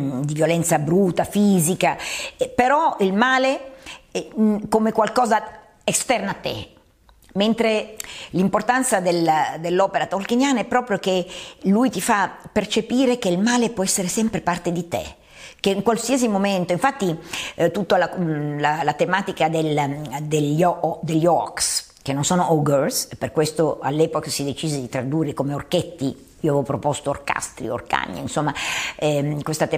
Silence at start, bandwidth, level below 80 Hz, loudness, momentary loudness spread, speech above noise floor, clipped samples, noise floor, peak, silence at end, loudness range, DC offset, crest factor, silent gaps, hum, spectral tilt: 0 s; 15.5 kHz; -52 dBFS; -21 LUFS; 9 LU; 33 dB; under 0.1%; -54 dBFS; -2 dBFS; 0 s; 4 LU; under 0.1%; 18 dB; none; none; -4.5 dB/octave